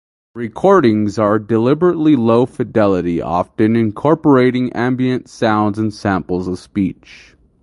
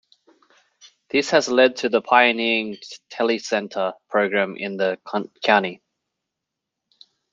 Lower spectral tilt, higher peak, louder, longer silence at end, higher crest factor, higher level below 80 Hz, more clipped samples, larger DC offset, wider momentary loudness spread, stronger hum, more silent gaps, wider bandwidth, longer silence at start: first, -8 dB/octave vs -3.5 dB/octave; about the same, 0 dBFS vs -2 dBFS; first, -15 LUFS vs -20 LUFS; second, 0.7 s vs 1.55 s; second, 14 dB vs 22 dB; first, -44 dBFS vs -72 dBFS; neither; neither; second, 8 LU vs 12 LU; neither; neither; first, 11 kHz vs 7.6 kHz; second, 0.35 s vs 1.15 s